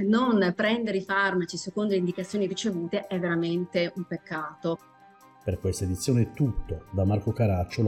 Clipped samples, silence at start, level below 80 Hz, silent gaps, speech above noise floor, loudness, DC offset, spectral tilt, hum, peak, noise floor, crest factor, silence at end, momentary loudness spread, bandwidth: under 0.1%; 0 s; -46 dBFS; none; 27 dB; -28 LUFS; under 0.1%; -6 dB/octave; none; -14 dBFS; -54 dBFS; 14 dB; 0 s; 9 LU; 15 kHz